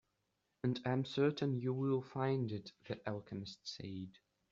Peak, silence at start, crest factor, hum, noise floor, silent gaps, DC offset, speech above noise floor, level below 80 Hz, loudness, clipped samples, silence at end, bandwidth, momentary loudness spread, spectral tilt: -22 dBFS; 0.65 s; 18 dB; none; -84 dBFS; none; under 0.1%; 45 dB; -76 dBFS; -40 LUFS; under 0.1%; 0.4 s; 7.6 kHz; 12 LU; -6 dB/octave